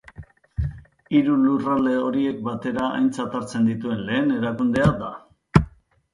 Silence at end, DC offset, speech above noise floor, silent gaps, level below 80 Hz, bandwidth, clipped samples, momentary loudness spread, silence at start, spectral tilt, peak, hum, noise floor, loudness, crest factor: 0.45 s; under 0.1%; 23 dB; none; -40 dBFS; 11.5 kHz; under 0.1%; 11 LU; 0.2 s; -7.5 dB/octave; 0 dBFS; none; -44 dBFS; -22 LUFS; 22 dB